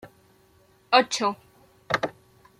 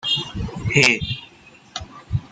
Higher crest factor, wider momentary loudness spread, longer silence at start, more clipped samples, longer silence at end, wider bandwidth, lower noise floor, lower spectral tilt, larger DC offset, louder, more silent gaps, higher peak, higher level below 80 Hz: about the same, 24 dB vs 22 dB; second, 12 LU vs 19 LU; about the same, 0.05 s vs 0.05 s; neither; first, 0.5 s vs 0.05 s; first, 15 kHz vs 9.6 kHz; first, -60 dBFS vs -48 dBFS; about the same, -2.5 dB/octave vs -3.5 dB/octave; neither; second, -24 LUFS vs -19 LUFS; neither; second, -6 dBFS vs -2 dBFS; second, -66 dBFS vs -42 dBFS